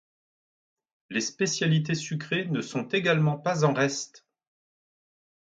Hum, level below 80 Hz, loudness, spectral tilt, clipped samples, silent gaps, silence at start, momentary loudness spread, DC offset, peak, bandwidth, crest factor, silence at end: none; -70 dBFS; -27 LUFS; -5 dB/octave; under 0.1%; none; 1.1 s; 7 LU; under 0.1%; -10 dBFS; 9 kHz; 20 dB; 1.25 s